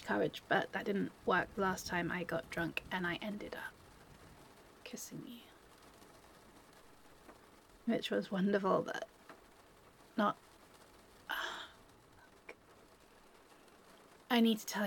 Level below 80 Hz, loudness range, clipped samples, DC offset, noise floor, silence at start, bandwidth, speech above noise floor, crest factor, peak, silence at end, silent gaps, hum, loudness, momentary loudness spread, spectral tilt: -68 dBFS; 15 LU; under 0.1%; under 0.1%; -63 dBFS; 0 s; 17.5 kHz; 26 dB; 22 dB; -18 dBFS; 0 s; none; none; -37 LUFS; 26 LU; -5 dB/octave